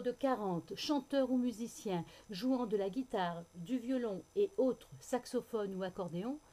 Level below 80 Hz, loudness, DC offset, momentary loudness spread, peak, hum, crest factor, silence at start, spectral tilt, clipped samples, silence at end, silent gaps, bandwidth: -70 dBFS; -38 LUFS; under 0.1%; 7 LU; -22 dBFS; none; 14 dB; 0 s; -5.5 dB/octave; under 0.1%; 0.15 s; none; 15.5 kHz